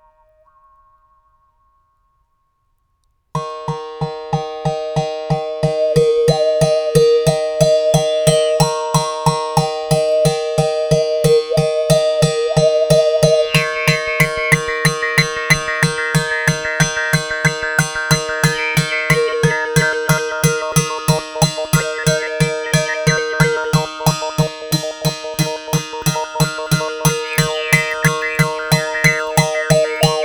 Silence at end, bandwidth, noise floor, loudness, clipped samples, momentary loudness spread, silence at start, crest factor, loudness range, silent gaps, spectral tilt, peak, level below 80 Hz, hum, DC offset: 0 s; over 20 kHz; -64 dBFS; -16 LUFS; under 0.1%; 7 LU; 3.35 s; 16 dB; 6 LU; none; -4.5 dB/octave; 0 dBFS; -42 dBFS; none; under 0.1%